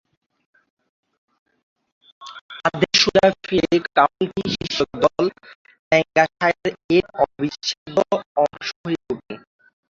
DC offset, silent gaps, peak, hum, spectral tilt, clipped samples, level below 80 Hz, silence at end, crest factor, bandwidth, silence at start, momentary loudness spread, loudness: under 0.1%; 2.41-2.49 s, 5.55-5.65 s, 5.79-5.91 s, 6.84-6.89 s, 7.77-7.86 s, 8.26-8.35 s, 8.76-8.84 s; -2 dBFS; none; -4 dB/octave; under 0.1%; -54 dBFS; 0.5 s; 20 dB; 7.8 kHz; 2.2 s; 13 LU; -20 LUFS